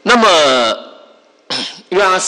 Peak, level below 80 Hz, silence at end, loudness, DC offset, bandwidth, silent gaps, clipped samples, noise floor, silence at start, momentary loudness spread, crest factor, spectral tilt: -2 dBFS; -52 dBFS; 0 s; -12 LUFS; under 0.1%; 12.5 kHz; none; under 0.1%; -46 dBFS; 0.05 s; 13 LU; 12 dB; -2 dB/octave